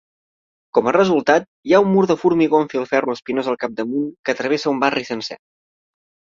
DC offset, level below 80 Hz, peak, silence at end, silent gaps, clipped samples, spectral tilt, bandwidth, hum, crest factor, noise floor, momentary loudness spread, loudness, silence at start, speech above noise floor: under 0.1%; -62 dBFS; -2 dBFS; 1 s; 1.48-1.63 s, 4.19-4.24 s; under 0.1%; -6 dB/octave; 7.6 kHz; none; 18 dB; under -90 dBFS; 8 LU; -18 LUFS; 0.75 s; over 72 dB